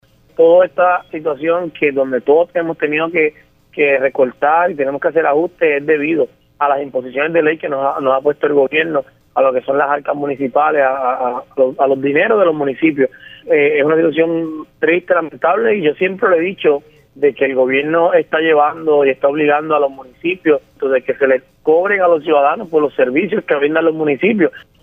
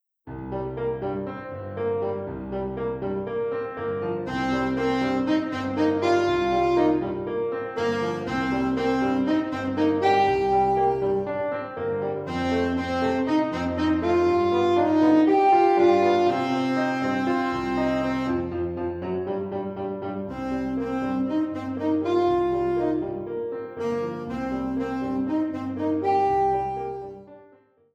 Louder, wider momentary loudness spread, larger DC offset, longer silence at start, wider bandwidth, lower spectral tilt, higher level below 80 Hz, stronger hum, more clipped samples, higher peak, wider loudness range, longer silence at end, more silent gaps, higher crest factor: first, -15 LUFS vs -24 LUFS; second, 6 LU vs 10 LU; neither; first, 0.4 s vs 0.25 s; second, 3.7 kHz vs 8.6 kHz; about the same, -8 dB/octave vs -7 dB/octave; second, -60 dBFS vs -50 dBFS; neither; neither; first, -2 dBFS vs -8 dBFS; second, 2 LU vs 8 LU; second, 0.25 s vs 0.5 s; neither; about the same, 12 dB vs 16 dB